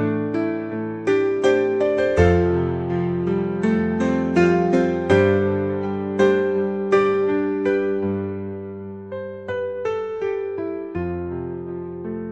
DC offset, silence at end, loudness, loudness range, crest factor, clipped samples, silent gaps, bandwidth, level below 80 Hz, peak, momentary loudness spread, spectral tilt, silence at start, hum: under 0.1%; 0 s; -21 LUFS; 8 LU; 18 dB; under 0.1%; none; 8.4 kHz; -48 dBFS; -4 dBFS; 13 LU; -8 dB/octave; 0 s; none